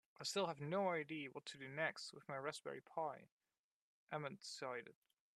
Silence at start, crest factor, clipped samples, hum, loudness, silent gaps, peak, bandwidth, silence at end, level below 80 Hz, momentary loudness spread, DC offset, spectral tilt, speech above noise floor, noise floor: 0.2 s; 20 dB; under 0.1%; none; -46 LUFS; 3.32-3.38 s, 3.58-4.07 s; -26 dBFS; 13 kHz; 0.45 s; under -90 dBFS; 10 LU; under 0.1%; -4 dB/octave; over 44 dB; under -90 dBFS